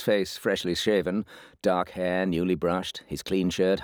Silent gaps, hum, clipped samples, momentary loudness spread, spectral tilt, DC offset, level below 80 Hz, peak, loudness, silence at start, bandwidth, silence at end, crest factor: none; none; under 0.1%; 7 LU; -5 dB/octave; under 0.1%; -56 dBFS; -10 dBFS; -27 LUFS; 0 s; over 20 kHz; 0 s; 16 dB